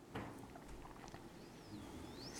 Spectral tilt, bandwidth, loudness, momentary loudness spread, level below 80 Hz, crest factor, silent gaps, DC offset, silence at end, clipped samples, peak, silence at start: -4.5 dB/octave; 19 kHz; -54 LUFS; 5 LU; -64 dBFS; 18 dB; none; under 0.1%; 0 s; under 0.1%; -34 dBFS; 0 s